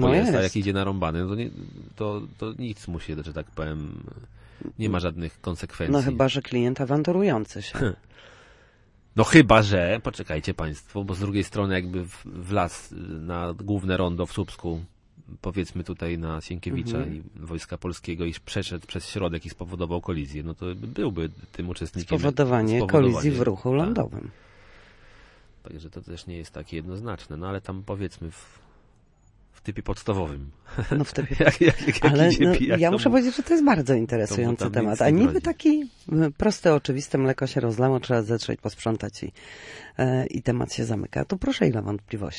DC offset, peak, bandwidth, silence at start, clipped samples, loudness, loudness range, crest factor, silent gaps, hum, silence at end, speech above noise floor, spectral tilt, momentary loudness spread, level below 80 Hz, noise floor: under 0.1%; -2 dBFS; 11.5 kHz; 0 s; under 0.1%; -25 LUFS; 13 LU; 22 dB; none; none; 0 s; 33 dB; -6.5 dB/octave; 17 LU; -44 dBFS; -58 dBFS